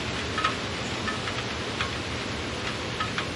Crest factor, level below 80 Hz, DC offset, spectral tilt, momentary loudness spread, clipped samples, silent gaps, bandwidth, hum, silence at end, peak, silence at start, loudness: 20 dB; -46 dBFS; under 0.1%; -3.5 dB/octave; 4 LU; under 0.1%; none; 11.5 kHz; none; 0 s; -10 dBFS; 0 s; -29 LUFS